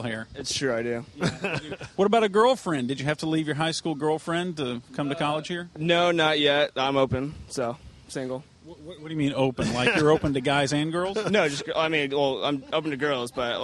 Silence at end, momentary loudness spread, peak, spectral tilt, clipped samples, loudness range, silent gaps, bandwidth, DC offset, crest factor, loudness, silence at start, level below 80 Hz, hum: 0 s; 12 LU; -8 dBFS; -5 dB/octave; under 0.1%; 4 LU; none; 12.5 kHz; under 0.1%; 18 dB; -25 LUFS; 0 s; -54 dBFS; none